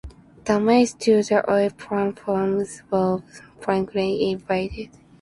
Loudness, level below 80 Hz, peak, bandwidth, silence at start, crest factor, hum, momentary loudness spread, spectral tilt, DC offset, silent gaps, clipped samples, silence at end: -22 LUFS; -50 dBFS; -4 dBFS; 11.5 kHz; 0.05 s; 18 dB; none; 12 LU; -5.5 dB/octave; under 0.1%; none; under 0.1%; 0.35 s